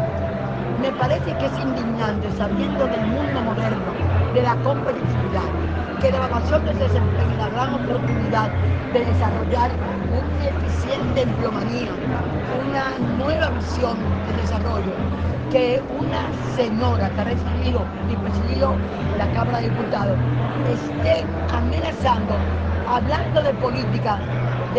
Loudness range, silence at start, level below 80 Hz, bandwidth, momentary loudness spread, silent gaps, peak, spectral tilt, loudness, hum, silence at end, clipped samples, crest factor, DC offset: 2 LU; 0 s; -36 dBFS; 7.6 kHz; 4 LU; none; -4 dBFS; -7.5 dB/octave; -22 LUFS; none; 0 s; under 0.1%; 16 dB; under 0.1%